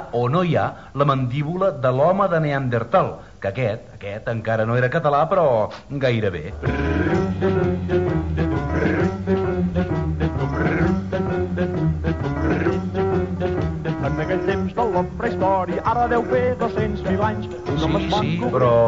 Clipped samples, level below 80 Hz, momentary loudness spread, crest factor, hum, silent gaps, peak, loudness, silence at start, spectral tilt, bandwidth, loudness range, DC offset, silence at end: under 0.1%; -36 dBFS; 6 LU; 14 dB; none; none; -6 dBFS; -21 LUFS; 0 s; -8 dB/octave; 7.6 kHz; 2 LU; 0.2%; 0 s